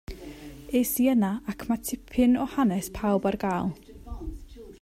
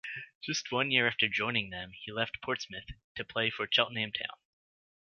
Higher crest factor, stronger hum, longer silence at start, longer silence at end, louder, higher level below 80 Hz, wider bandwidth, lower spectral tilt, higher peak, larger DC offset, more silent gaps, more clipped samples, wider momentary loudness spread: second, 16 dB vs 24 dB; neither; about the same, 0.1 s vs 0.05 s; second, 0.05 s vs 0.7 s; first, -26 LUFS vs -31 LUFS; first, -46 dBFS vs -62 dBFS; first, 16 kHz vs 7.4 kHz; first, -5.5 dB/octave vs -3 dB/octave; about the same, -12 dBFS vs -10 dBFS; neither; second, none vs 0.35-0.41 s, 3.04-3.15 s; neither; first, 20 LU vs 14 LU